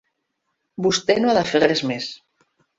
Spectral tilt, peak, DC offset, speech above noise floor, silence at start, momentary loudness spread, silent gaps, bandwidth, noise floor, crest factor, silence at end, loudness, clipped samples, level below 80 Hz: -4 dB/octave; -4 dBFS; under 0.1%; 56 dB; 0.8 s; 12 LU; none; 8 kHz; -75 dBFS; 20 dB; 0.6 s; -20 LUFS; under 0.1%; -58 dBFS